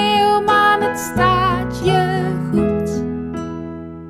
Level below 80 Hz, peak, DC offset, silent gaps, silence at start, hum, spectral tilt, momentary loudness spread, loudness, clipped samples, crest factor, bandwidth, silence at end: -38 dBFS; -2 dBFS; under 0.1%; none; 0 s; none; -5.5 dB/octave; 13 LU; -17 LUFS; under 0.1%; 14 dB; 17.5 kHz; 0 s